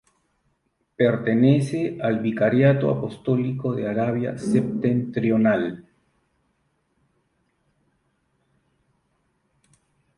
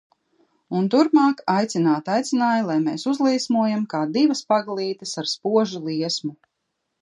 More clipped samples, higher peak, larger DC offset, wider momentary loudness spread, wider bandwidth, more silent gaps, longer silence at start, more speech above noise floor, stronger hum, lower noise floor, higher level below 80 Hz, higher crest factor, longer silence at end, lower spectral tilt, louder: neither; about the same, -6 dBFS vs -4 dBFS; neither; about the same, 8 LU vs 9 LU; about the same, 11.5 kHz vs 11 kHz; neither; first, 1 s vs 0.7 s; second, 50 dB vs 56 dB; neither; second, -71 dBFS vs -77 dBFS; first, -60 dBFS vs -76 dBFS; about the same, 18 dB vs 16 dB; first, 4.35 s vs 0.65 s; first, -8.5 dB/octave vs -5 dB/octave; about the same, -22 LUFS vs -21 LUFS